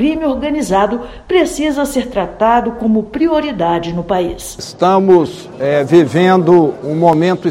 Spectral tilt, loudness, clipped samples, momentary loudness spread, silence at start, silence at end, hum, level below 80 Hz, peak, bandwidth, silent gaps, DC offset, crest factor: -6 dB/octave; -13 LUFS; 0.3%; 8 LU; 0 s; 0 s; none; -38 dBFS; 0 dBFS; 15.5 kHz; none; under 0.1%; 12 dB